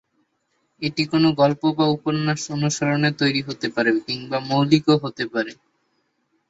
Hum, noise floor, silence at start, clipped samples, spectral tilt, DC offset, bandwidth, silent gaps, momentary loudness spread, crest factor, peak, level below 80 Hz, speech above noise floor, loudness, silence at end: none; -70 dBFS; 0.8 s; under 0.1%; -5.5 dB/octave; under 0.1%; 8 kHz; none; 8 LU; 18 dB; -4 dBFS; -60 dBFS; 49 dB; -21 LUFS; 0.95 s